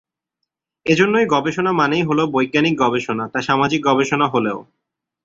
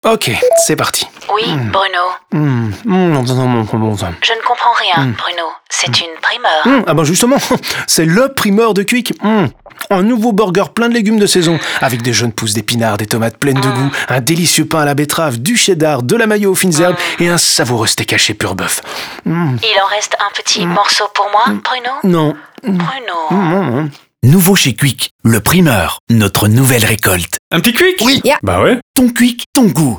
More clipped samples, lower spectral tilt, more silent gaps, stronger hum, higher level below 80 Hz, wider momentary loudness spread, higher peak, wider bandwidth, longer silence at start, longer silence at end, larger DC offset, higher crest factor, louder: neither; first, -5.5 dB/octave vs -4 dB/octave; second, none vs 25.11-25.19 s, 26.00-26.07 s, 27.39-27.51 s, 28.82-28.94 s, 29.46-29.53 s; neither; second, -56 dBFS vs -46 dBFS; about the same, 7 LU vs 7 LU; about the same, -2 dBFS vs 0 dBFS; second, 7.8 kHz vs over 20 kHz; first, 0.85 s vs 0.05 s; first, 0.6 s vs 0 s; neither; first, 18 dB vs 12 dB; second, -17 LUFS vs -12 LUFS